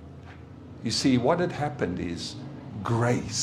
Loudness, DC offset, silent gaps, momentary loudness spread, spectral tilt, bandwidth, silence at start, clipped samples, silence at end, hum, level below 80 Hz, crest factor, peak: -27 LUFS; under 0.1%; none; 22 LU; -5 dB/octave; 13 kHz; 0 s; under 0.1%; 0 s; none; -54 dBFS; 18 dB; -10 dBFS